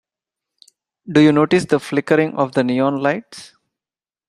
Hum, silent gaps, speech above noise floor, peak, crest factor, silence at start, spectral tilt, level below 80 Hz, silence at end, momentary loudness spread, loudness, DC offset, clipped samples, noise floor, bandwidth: none; none; over 74 dB; -2 dBFS; 18 dB; 1.05 s; -6.5 dB/octave; -60 dBFS; 0.85 s; 11 LU; -17 LUFS; under 0.1%; under 0.1%; under -90 dBFS; 11.5 kHz